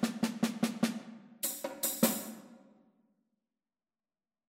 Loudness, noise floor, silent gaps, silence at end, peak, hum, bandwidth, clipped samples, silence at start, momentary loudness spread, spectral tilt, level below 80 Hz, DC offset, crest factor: -34 LUFS; under -90 dBFS; none; 1.9 s; -12 dBFS; none; 16.5 kHz; under 0.1%; 0 s; 16 LU; -3.5 dB/octave; -78 dBFS; under 0.1%; 24 dB